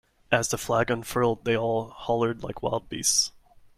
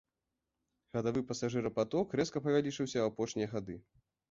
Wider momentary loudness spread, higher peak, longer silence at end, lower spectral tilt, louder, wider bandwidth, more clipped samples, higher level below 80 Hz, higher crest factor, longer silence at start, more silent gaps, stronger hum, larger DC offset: about the same, 8 LU vs 9 LU; first, -6 dBFS vs -18 dBFS; about the same, 0.4 s vs 0.5 s; second, -3 dB/octave vs -5.5 dB/octave; first, -26 LUFS vs -35 LUFS; first, 16 kHz vs 7.8 kHz; neither; first, -52 dBFS vs -66 dBFS; about the same, 22 dB vs 18 dB; second, 0.3 s vs 0.95 s; neither; neither; neither